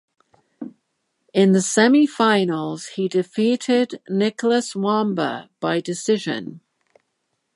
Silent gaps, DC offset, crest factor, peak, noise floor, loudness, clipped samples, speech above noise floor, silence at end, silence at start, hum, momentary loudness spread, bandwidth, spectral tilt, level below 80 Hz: none; under 0.1%; 18 dB; -2 dBFS; -74 dBFS; -20 LUFS; under 0.1%; 54 dB; 1 s; 0.6 s; none; 13 LU; 11.5 kHz; -5 dB/octave; -74 dBFS